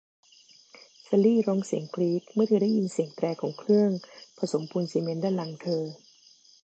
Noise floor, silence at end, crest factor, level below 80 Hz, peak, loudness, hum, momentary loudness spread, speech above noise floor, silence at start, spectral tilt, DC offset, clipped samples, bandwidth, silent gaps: -58 dBFS; 0.7 s; 16 dB; -80 dBFS; -12 dBFS; -27 LUFS; none; 9 LU; 31 dB; 1.1 s; -7.5 dB/octave; under 0.1%; under 0.1%; 8.8 kHz; none